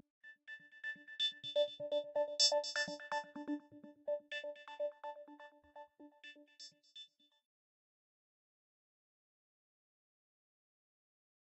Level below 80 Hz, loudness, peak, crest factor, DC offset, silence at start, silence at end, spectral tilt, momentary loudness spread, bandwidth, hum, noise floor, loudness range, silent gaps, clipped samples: under -90 dBFS; -39 LUFS; -18 dBFS; 26 dB; under 0.1%; 0.25 s; 4.45 s; -0.5 dB/octave; 24 LU; 10 kHz; none; -60 dBFS; 23 LU; none; under 0.1%